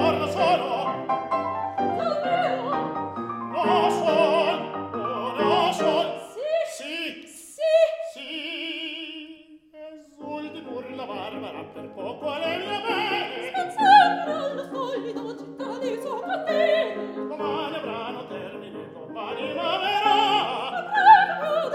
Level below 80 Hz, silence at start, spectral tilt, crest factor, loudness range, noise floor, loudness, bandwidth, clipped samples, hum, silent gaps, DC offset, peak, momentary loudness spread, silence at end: -68 dBFS; 0 s; -4 dB/octave; 22 dB; 10 LU; -47 dBFS; -24 LUFS; 14.5 kHz; under 0.1%; none; none; under 0.1%; -2 dBFS; 16 LU; 0 s